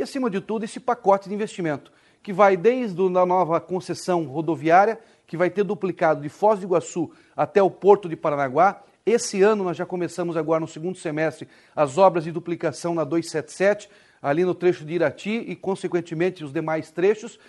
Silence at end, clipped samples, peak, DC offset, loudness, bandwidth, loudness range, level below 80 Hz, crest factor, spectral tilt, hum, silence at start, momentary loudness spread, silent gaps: 0.15 s; under 0.1%; -2 dBFS; under 0.1%; -23 LUFS; 12 kHz; 3 LU; -70 dBFS; 20 dB; -6 dB/octave; none; 0 s; 11 LU; none